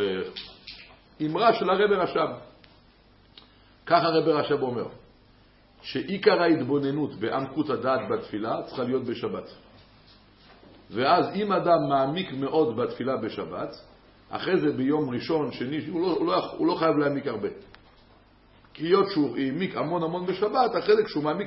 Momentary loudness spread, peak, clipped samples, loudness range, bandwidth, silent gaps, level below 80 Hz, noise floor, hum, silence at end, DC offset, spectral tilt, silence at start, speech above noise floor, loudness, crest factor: 13 LU; -6 dBFS; under 0.1%; 3 LU; 5.8 kHz; none; -62 dBFS; -57 dBFS; none; 0 s; under 0.1%; -10 dB/octave; 0 s; 32 dB; -26 LUFS; 20 dB